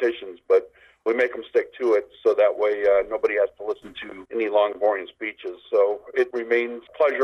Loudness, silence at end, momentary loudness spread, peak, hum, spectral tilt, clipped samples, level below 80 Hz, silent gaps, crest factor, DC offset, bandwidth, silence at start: -23 LUFS; 0 s; 12 LU; -8 dBFS; none; -4.5 dB/octave; under 0.1%; -64 dBFS; none; 14 dB; under 0.1%; 6.6 kHz; 0 s